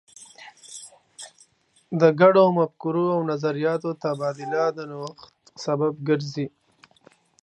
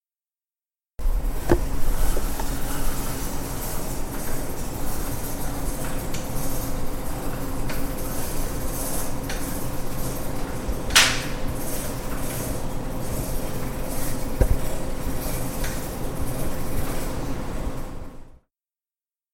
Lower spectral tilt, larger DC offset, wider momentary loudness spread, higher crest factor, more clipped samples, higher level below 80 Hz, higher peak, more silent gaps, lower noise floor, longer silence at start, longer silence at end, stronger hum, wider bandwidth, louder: first, -6.5 dB/octave vs -3.5 dB/octave; neither; first, 26 LU vs 7 LU; about the same, 22 dB vs 24 dB; neither; second, -74 dBFS vs -28 dBFS; about the same, -2 dBFS vs 0 dBFS; neither; second, -60 dBFS vs under -90 dBFS; second, 0.2 s vs 1 s; about the same, 0.95 s vs 1 s; neither; second, 11.5 kHz vs 16.5 kHz; first, -23 LUFS vs -28 LUFS